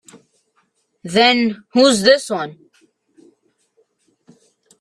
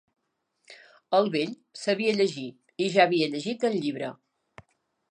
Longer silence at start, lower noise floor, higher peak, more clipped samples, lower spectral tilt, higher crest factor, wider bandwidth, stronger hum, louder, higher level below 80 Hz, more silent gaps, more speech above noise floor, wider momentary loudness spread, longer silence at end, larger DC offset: first, 1.05 s vs 0.7 s; second, -65 dBFS vs -76 dBFS; first, 0 dBFS vs -6 dBFS; neither; second, -3.5 dB/octave vs -5 dB/octave; about the same, 20 dB vs 22 dB; first, 14 kHz vs 10 kHz; neither; first, -15 LUFS vs -26 LUFS; first, -64 dBFS vs -78 dBFS; neither; about the same, 50 dB vs 50 dB; about the same, 14 LU vs 13 LU; first, 2.25 s vs 1 s; neither